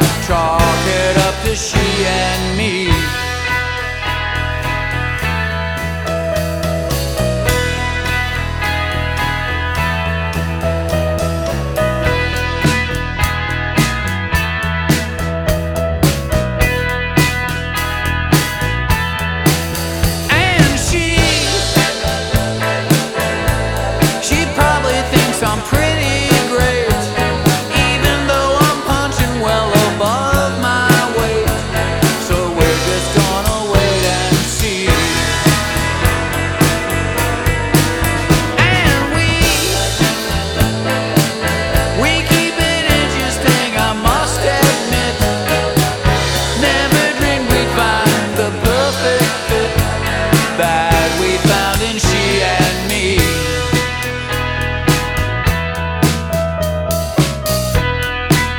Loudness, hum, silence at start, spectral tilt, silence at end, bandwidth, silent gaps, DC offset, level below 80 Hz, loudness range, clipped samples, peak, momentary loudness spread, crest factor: -15 LUFS; none; 0 s; -4 dB/octave; 0 s; over 20 kHz; none; under 0.1%; -24 dBFS; 4 LU; under 0.1%; 0 dBFS; 5 LU; 14 dB